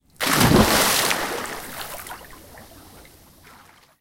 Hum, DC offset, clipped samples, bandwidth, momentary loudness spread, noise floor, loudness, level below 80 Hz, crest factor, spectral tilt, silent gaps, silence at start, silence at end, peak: none; under 0.1%; under 0.1%; 17 kHz; 19 LU; -51 dBFS; -19 LUFS; -40 dBFS; 22 dB; -3.5 dB/octave; none; 0.2 s; 1 s; -2 dBFS